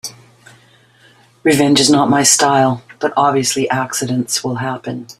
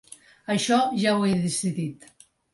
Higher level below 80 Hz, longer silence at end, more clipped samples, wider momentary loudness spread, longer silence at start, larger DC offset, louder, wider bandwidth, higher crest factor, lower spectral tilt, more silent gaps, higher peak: first, -54 dBFS vs -64 dBFS; second, 0.05 s vs 0.6 s; neither; about the same, 11 LU vs 11 LU; second, 0.05 s vs 0.5 s; neither; first, -14 LUFS vs -24 LUFS; first, 15 kHz vs 11.5 kHz; about the same, 16 dB vs 16 dB; about the same, -3.5 dB/octave vs -4.5 dB/octave; neither; first, 0 dBFS vs -10 dBFS